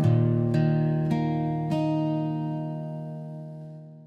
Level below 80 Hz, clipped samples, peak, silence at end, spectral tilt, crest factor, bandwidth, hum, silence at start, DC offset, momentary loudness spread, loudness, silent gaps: -60 dBFS; under 0.1%; -12 dBFS; 0 s; -9.5 dB/octave; 14 dB; 5.6 kHz; none; 0 s; under 0.1%; 16 LU; -26 LUFS; none